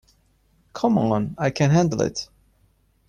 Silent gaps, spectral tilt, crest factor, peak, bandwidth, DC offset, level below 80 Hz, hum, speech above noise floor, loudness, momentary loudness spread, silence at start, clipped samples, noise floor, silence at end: none; -6.5 dB/octave; 16 dB; -8 dBFS; 10 kHz; under 0.1%; -52 dBFS; none; 42 dB; -22 LUFS; 16 LU; 0.75 s; under 0.1%; -62 dBFS; 0.85 s